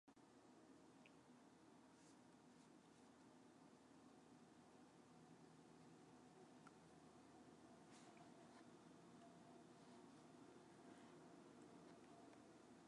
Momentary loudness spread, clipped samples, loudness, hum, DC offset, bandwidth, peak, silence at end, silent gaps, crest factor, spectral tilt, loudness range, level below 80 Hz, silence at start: 4 LU; under 0.1%; -67 LUFS; none; under 0.1%; 11 kHz; -52 dBFS; 0 s; none; 16 dB; -5 dB/octave; 3 LU; under -90 dBFS; 0.05 s